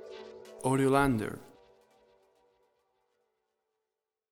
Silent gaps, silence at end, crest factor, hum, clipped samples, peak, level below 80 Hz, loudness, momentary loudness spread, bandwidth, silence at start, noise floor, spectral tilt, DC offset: none; 2.9 s; 22 dB; none; under 0.1%; -12 dBFS; -56 dBFS; -29 LUFS; 22 LU; 16.5 kHz; 0 s; -89 dBFS; -6.5 dB/octave; under 0.1%